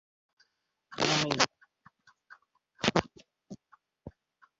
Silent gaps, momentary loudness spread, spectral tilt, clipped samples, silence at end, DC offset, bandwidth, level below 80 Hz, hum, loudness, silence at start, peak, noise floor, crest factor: none; 26 LU; -2.5 dB/octave; under 0.1%; 0.5 s; under 0.1%; 8 kHz; -64 dBFS; none; -29 LUFS; 0.9 s; -6 dBFS; -75 dBFS; 30 dB